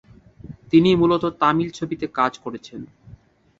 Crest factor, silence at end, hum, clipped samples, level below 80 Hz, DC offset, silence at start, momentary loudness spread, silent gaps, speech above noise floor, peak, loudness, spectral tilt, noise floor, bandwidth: 18 dB; 0.75 s; none; under 0.1%; -52 dBFS; under 0.1%; 0.45 s; 19 LU; none; 29 dB; -2 dBFS; -20 LUFS; -7 dB/octave; -49 dBFS; 7.8 kHz